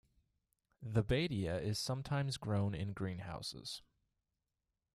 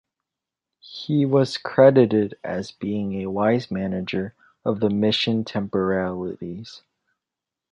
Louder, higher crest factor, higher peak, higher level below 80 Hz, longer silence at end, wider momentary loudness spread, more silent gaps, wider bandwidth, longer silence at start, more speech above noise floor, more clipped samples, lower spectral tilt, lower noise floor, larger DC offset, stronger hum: second, -39 LUFS vs -22 LUFS; about the same, 22 dB vs 20 dB; second, -18 dBFS vs -2 dBFS; about the same, -58 dBFS vs -56 dBFS; first, 1.15 s vs 0.95 s; second, 11 LU vs 17 LU; neither; first, 13.5 kHz vs 10.5 kHz; about the same, 0.8 s vs 0.85 s; second, 51 dB vs 65 dB; neither; second, -5.5 dB/octave vs -7 dB/octave; about the same, -89 dBFS vs -87 dBFS; neither; neither